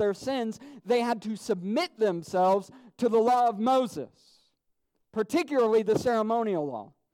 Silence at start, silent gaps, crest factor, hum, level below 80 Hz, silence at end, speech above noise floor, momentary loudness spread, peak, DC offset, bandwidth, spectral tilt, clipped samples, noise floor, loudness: 0 s; none; 14 dB; none; -70 dBFS; 0.3 s; 49 dB; 12 LU; -14 dBFS; under 0.1%; 15.5 kHz; -5.5 dB/octave; under 0.1%; -76 dBFS; -27 LUFS